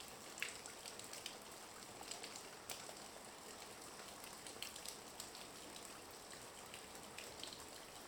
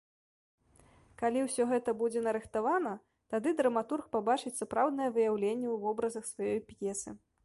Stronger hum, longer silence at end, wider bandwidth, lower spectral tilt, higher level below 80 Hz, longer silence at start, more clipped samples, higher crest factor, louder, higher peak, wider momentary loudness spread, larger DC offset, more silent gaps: neither; second, 0 s vs 0.25 s; first, over 20 kHz vs 11.5 kHz; second, -1 dB/octave vs -4.5 dB/octave; second, -76 dBFS vs -70 dBFS; second, 0 s vs 1.2 s; neither; first, 30 dB vs 18 dB; second, -51 LUFS vs -33 LUFS; second, -24 dBFS vs -16 dBFS; about the same, 5 LU vs 7 LU; neither; neither